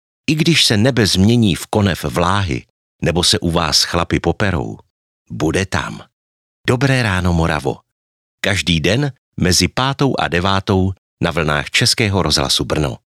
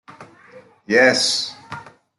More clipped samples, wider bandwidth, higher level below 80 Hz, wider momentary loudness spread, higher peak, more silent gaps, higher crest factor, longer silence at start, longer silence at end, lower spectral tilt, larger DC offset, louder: neither; first, 15.5 kHz vs 12 kHz; first, -36 dBFS vs -66 dBFS; second, 10 LU vs 22 LU; about the same, 0 dBFS vs -2 dBFS; first, 2.70-2.99 s, 4.90-5.25 s, 6.13-6.64 s, 7.92-8.38 s, 9.18-9.32 s, 10.98-11.17 s vs none; about the same, 16 dB vs 20 dB; first, 0.3 s vs 0.1 s; second, 0.2 s vs 0.35 s; first, -4.5 dB/octave vs -2 dB/octave; neither; about the same, -16 LUFS vs -17 LUFS